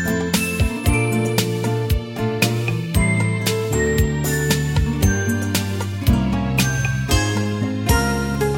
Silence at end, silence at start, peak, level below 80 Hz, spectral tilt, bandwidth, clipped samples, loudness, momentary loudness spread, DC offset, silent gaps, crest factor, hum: 0 s; 0 s; -2 dBFS; -28 dBFS; -5 dB/octave; 17 kHz; under 0.1%; -20 LUFS; 3 LU; under 0.1%; none; 16 dB; none